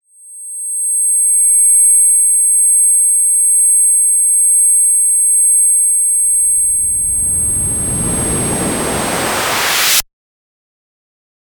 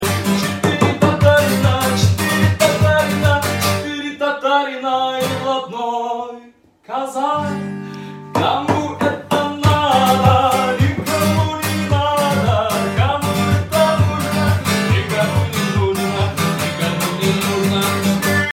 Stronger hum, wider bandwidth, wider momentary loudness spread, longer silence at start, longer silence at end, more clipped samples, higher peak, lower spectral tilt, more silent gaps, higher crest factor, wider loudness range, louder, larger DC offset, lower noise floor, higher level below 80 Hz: neither; first, 19.5 kHz vs 17 kHz; about the same, 9 LU vs 8 LU; first, 0.25 s vs 0 s; first, 1.45 s vs 0 s; neither; about the same, 0 dBFS vs 0 dBFS; second, -0.5 dB/octave vs -5 dB/octave; neither; about the same, 12 dB vs 16 dB; about the same, 7 LU vs 6 LU; first, -9 LUFS vs -17 LUFS; first, 0.6% vs under 0.1%; second, -33 dBFS vs -46 dBFS; about the same, -38 dBFS vs -42 dBFS